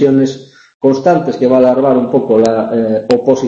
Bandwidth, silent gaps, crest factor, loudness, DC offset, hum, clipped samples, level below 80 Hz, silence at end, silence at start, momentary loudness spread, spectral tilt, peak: 8.2 kHz; 0.74-0.80 s; 10 dB; -11 LUFS; under 0.1%; none; under 0.1%; -52 dBFS; 0 s; 0 s; 5 LU; -7 dB/octave; 0 dBFS